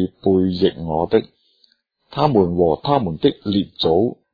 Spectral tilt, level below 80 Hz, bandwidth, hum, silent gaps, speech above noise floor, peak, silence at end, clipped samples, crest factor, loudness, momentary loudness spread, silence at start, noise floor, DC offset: -9.5 dB/octave; -46 dBFS; 5 kHz; none; none; 42 dB; -2 dBFS; 0.2 s; under 0.1%; 18 dB; -18 LUFS; 5 LU; 0 s; -60 dBFS; under 0.1%